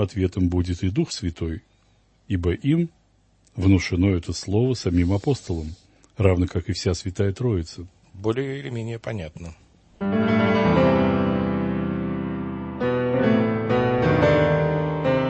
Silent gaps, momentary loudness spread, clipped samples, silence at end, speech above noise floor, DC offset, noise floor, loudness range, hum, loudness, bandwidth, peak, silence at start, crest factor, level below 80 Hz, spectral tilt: none; 12 LU; under 0.1%; 0 s; 37 dB; under 0.1%; -60 dBFS; 5 LU; none; -23 LUFS; 8.6 kHz; -4 dBFS; 0 s; 20 dB; -42 dBFS; -7 dB/octave